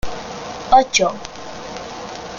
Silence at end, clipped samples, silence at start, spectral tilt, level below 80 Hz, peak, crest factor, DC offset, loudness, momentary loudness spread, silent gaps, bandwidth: 0 s; under 0.1%; 0.05 s; -2.5 dB/octave; -40 dBFS; 0 dBFS; 20 dB; under 0.1%; -16 LUFS; 18 LU; none; 15.5 kHz